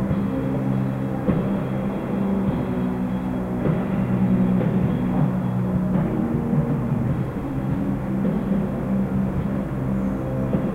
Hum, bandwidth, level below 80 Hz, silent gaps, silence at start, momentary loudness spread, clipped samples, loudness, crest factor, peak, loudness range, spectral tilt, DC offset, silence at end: none; 4.3 kHz; -38 dBFS; none; 0 s; 5 LU; under 0.1%; -23 LUFS; 14 dB; -8 dBFS; 2 LU; -10 dB/octave; under 0.1%; 0 s